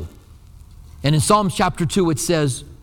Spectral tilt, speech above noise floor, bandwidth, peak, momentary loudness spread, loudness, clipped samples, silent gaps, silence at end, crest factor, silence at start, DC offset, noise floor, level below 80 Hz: -5 dB/octave; 26 dB; 18 kHz; -2 dBFS; 8 LU; -19 LUFS; under 0.1%; none; 0.1 s; 18 dB; 0 s; under 0.1%; -43 dBFS; -40 dBFS